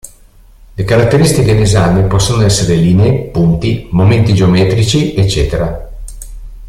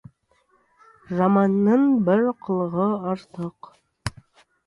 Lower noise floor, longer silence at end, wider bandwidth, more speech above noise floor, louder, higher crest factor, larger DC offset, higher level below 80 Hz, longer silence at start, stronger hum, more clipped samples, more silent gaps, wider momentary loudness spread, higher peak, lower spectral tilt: second, -40 dBFS vs -64 dBFS; second, 0 s vs 0.55 s; first, 14.5 kHz vs 11.5 kHz; second, 31 dB vs 44 dB; first, -11 LUFS vs -21 LUFS; second, 10 dB vs 16 dB; neither; first, -26 dBFS vs -54 dBFS; second, 0.05 s vs 1.1 s; neither; neither; neither; about the same, 18 LU vs 16 LU; first, 0 dBFS vs -8 dBFS; second, -6 dB/octave vs -8.5 dB/octave